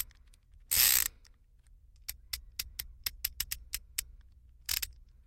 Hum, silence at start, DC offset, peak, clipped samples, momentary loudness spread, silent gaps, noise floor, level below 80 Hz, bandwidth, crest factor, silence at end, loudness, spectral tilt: none; 0 s; under 0.1%; -8 dBFS; under 0.1%; 19 LU; none; -61 dBFS; -52 dBFS; 17 kHz; 28 dB; 0.35 s; -32 LUFS; 1.5 dB/octave